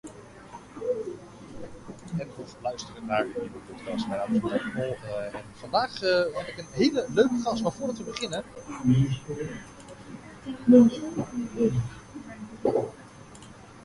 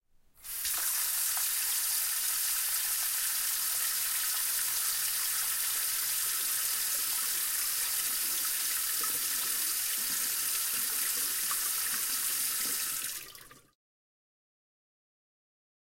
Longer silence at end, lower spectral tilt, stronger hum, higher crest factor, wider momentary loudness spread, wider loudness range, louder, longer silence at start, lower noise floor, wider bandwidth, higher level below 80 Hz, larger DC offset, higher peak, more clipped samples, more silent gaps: second, 0 s vs 2.4 s; first, -6.5 dB/octave vs 3 dB/octave; neither; first, 22 dB vs 16 dB; first, 21 LU vs 1 LU; first, 9 LU vs 4 LU; about the same, -27 LUFS vs -29 LUFS; second, 0.05 s vs 0.4 s; second, -47 dBFS vs -52 dBFS; second, 11.5 kHz vs 16.5 kHz; first, -56 dBFS vs -68 dBFS; neither; first, -6 dBFS vs -16 dBFS; neither; neither